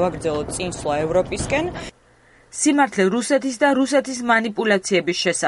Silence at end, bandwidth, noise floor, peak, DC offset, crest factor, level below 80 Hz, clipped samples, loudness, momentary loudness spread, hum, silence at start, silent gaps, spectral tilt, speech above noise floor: 0 s; 11.5 kHz; -53 dBFS; -4 dBFS; under 0.1%; 16 dB; -44 dBFS; under 0.1%; -20 LUFS; 8 LU; none; 0 s; none; -4 dB/octave; 33 dB